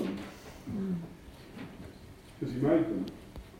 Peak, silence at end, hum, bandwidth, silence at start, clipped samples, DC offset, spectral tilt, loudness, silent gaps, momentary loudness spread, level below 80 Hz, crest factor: -14 dBFS; 0 s; none; 16 kHz; 0 s; under 0.1%; under 0.1%; -7.5 dB/octave; -33 LUFS; none; 21 LU; -56 dBFS; 20 dB